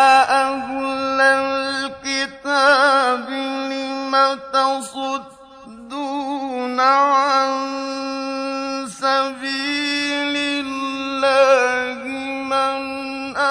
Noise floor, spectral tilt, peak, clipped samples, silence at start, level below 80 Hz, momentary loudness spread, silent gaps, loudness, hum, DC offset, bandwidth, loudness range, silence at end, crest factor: -41 dBFS; -2 dB/octave; -2 dBFS; under 0.1%; 0 s; -60 dBFS; 11 LU; none; -19 LUFS; none; under 0.1%; 11 kHz; 4 LU; 0 s; 16 dB